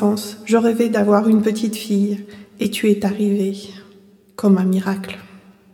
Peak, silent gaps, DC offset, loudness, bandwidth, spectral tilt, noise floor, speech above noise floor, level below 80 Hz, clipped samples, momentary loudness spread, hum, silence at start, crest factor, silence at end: -2 dBFS; none; under 0.1%; -18 LUFS; 17 kHz; -6.5 dB/octave; -48 dBFS; 31 dB; -62 dBFS; under 0.1%; 14 LU; none; 0 s; 16 dB; 0.35 s